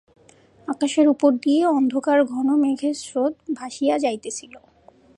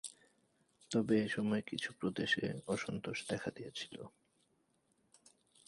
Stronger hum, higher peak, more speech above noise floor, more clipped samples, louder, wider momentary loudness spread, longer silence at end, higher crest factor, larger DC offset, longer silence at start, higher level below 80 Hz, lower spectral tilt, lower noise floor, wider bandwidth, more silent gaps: neither; first, -4 dBFS vs -20 dBFS; second, 33 dB vs 39 dB; neither; first, -21 LUFS vs -38 LUFS; about the same, 12 LU vs 13 LU; second, 0.6 s vs 1.6 s; about the same, 16 dB vs 20 dB; neither; first, 0.7 s vs 0.05 s; about the same, -70 dBFS vs -72 dBFS; second, -3.5 dB/octave vs -5 dB/octave; second, -53 dBFS vs -77 dBFS; about the same, 11 kHz vs 11.5 kHz; neither